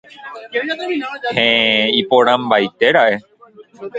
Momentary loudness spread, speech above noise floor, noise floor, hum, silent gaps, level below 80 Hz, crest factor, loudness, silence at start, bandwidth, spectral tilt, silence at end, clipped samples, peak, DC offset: 12 LU; 28 dB; -44 dBFS; none; none; -60 dBFS; 16 dB; -15 LUFS; 0.2 s; 8 kHz; -5 dB/octave; 0 s; under 0.1%; 0 dBFS; under 0.1%